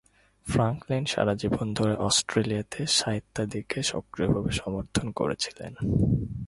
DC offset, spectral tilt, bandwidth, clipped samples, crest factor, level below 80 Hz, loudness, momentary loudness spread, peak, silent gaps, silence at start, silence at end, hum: under 0.1%; -4.5 dB/octave; 11.5 kHz; under 0.1%; 18 dB; -44 dBFS; -27 LUFS; 7 LU; -8 dBFS; none; 0.45 s; 0 s; none